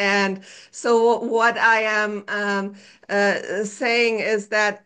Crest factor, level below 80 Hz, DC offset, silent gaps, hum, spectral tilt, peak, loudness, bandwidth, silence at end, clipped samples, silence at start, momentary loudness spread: 14 dB; -74 dBFS; under 0.1%; none; none; -3.5 dB/octave; -6 dBFS; -20 LUFS; 9.8 kHz; 0.1 s; under 0.1%; 0 s; 10 LU